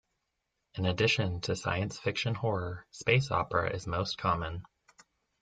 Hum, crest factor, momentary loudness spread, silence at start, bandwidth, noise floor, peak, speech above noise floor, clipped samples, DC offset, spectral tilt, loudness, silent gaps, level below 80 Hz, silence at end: none; 22 dB; 8 LU; 0.75 s; 9.2 kHz; -83 dBFS; -10 dBFS; 51 dB; under 0.1%; under 0.1%; -5 dB/octave; -31 LUFS; none; -56 dBFS; 0.8 s